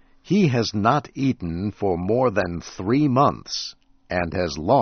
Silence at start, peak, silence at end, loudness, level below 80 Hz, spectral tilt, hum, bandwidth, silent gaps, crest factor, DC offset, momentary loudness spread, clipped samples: 0.25 s; -4 dBFS; 0 s; -22 LUFS; -48 dBFS; -5.5 dB/octave; none; 6.6 kHz; none; 18 dB; under 0.1%; 9 LU; under 0.1%